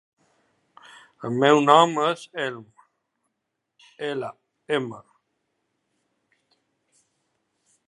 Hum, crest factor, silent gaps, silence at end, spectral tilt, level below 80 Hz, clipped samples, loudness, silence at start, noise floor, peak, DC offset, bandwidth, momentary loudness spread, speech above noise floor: none; 26 dB; none; 2.9 s; -5 dB/octave; -78 dBFS; under 0.1%; -22 LUFS; 1.2 s; -80 dBFS; -2 dBFS; under 0.1%; 11.5 kHz; 21 LU; 59 dB